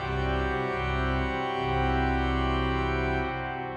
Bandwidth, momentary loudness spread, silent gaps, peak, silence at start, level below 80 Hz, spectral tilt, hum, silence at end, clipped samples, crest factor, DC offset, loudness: 7.8 kHz; 3 LU; none; -14 dBFS; 0 s; -34 dBFS; -7 dB/octave; none; 0 s; under 0.1%; 12 dB; under 0.1%; -28 LUFS